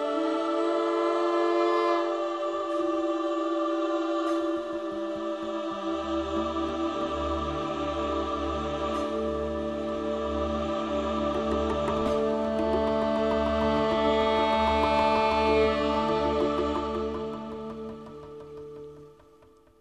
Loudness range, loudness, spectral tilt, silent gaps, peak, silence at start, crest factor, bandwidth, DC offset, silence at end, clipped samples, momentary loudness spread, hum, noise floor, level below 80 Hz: 6 LU; -27 LUFS; -6 dB/octave; none; -12 dBFS; 0 s; 16 dB; 10.5 kHz; under 0.1%; 0.7 s; under 0.1%; 9 LU; none; -57 dBFS; -44 dBFS